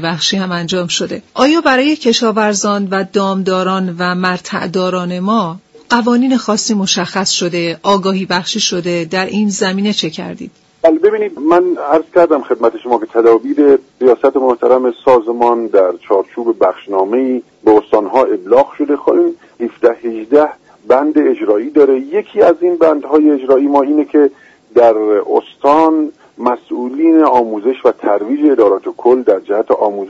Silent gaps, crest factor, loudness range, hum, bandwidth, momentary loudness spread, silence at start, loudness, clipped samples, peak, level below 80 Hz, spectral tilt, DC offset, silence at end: none; 12 dB; 3 LU; none; 8 kHz; 7 LU; 0 s; -13 LUFS; under 0.1%; 0 dBFS; -56 dBFS; -4.5 dB/octave; under 0.1%; 0 s